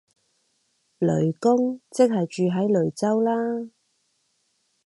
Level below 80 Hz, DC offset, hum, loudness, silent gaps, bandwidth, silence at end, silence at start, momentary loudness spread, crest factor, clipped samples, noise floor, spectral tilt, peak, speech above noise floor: -66 dBFS; under 0.1%; none; -23 LUFS; none; 11.5 kHz; 1.2 s; 1 s; 6 LU; 18 dB; under 0.1%; -71 dBFS; -7.5 dB/octave; -6 dBFS; 49 dB